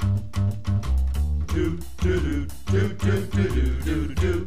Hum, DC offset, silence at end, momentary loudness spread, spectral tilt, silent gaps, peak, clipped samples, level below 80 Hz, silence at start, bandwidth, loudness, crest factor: none; 2%; 0 s; 3 LU; -7 dB/octave; none; -10 dBFS; under 0.1%; -28 dBFS; 0 s; 15 kHz; -25 LUFS; 12 dB